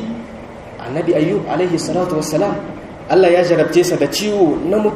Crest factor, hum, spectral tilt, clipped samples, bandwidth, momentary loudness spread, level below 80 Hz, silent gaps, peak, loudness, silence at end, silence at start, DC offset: 14 dB; none; -5.5 dB/octave; under 0.1%; 15 kHz; 18 LU; -46 dBFS; none; 0 dBFS; -16 LUFS; 0 s; 0 s; under 0.1%